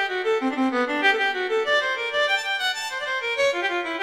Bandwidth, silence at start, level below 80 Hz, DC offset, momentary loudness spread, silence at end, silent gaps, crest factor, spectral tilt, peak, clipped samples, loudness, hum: 16 kHz; 0 s; -66 dBFS; under 0.1%; 5 LU; 0 s; none; 14 dB; -1.5 dB/octave; -10 dBFS; under 0.1%; -22 LUFS; none